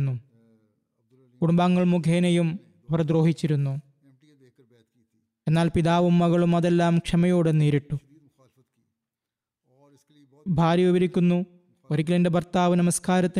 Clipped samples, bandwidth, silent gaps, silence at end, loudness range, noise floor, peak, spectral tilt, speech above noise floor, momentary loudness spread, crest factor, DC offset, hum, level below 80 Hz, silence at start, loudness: under 0.1%; 12.5 kHz; none; 0 s; 6 LU; -88 dBFS; -12 dBFS; -7 dB/octave; 67 dB; 10 LU; 12 dB; under 0.1%; none; -52 dBFS; 0 s; -23 LUFS